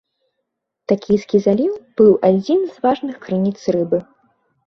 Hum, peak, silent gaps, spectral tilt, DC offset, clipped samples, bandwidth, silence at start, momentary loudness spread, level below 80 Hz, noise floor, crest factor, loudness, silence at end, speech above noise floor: none; 0 dBFS; none; -8 dB/octave; under 0.1%; under 0.1%; 6.4 kHz; 0.9 s; 9 LU; -58 dBFS; -76 dBFS; 16 dB; -17 LUFS; 0.65 s; 60 dB